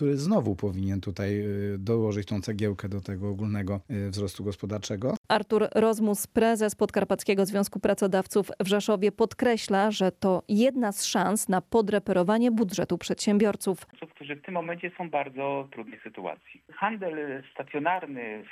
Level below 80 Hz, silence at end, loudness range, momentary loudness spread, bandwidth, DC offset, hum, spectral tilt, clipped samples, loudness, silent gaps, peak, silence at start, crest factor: -60 dBFS; 0 s; 8 LU; 12 LU; 15 kHz; under 0.1%; none; -5.5 dB/octave; under 0.1%; -27 LUFS; 5.17-5.24 s; -12 dBFS; 0 s; 16 dB